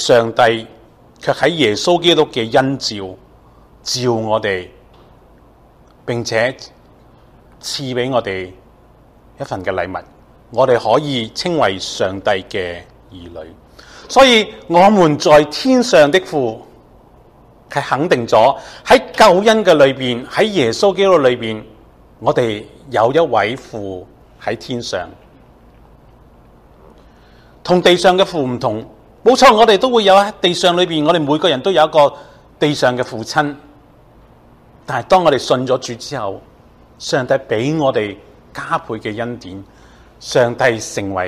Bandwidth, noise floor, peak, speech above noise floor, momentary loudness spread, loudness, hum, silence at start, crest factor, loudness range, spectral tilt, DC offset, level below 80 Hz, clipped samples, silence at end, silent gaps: 15 kHz; -47 dBFS; 0 dBFS; 32 dB; 17 LU; -14 LUFS; none; 0 s; 16 dB; 11 LU; -4.5 dB/octave; under 0.1%; -48 dBFS; under 0.1%; 0 s; none